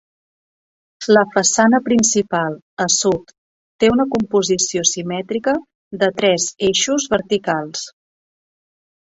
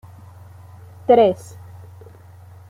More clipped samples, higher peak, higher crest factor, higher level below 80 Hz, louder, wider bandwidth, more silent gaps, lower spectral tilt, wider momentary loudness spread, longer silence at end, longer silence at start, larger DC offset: neither; about the same, -2 dBFS vs -2 dBFS; about the same, 18 dB vs 20 dB; first, -54 dBFS vs -62 dBFS; about the same, -17 LUFS vs -16 LUFS; second, 8.4 kHz vs 13.5 kHz; first, 2.62-2.77 s, 3.38-3.79 s, 5.75-5.91 s vs none; second, -3 dB/octave vs -7 dB/octave; second, 10 LU vs 27 LU; second, 1.15 s vs 1.35 s; about the same, 1 s vs 1.1 s; neither